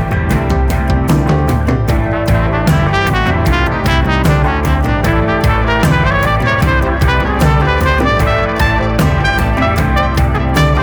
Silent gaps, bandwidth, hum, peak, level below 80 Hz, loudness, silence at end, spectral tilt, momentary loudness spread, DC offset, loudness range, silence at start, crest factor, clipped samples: none; over 20 kHz; none; 0 dBFS; -18 dBFS; -13 LUFS; 0 s; -6.5 dB/octave; 2 LU; under 0.1%; 1 LU; 0 s; 12 dB; under 0.1%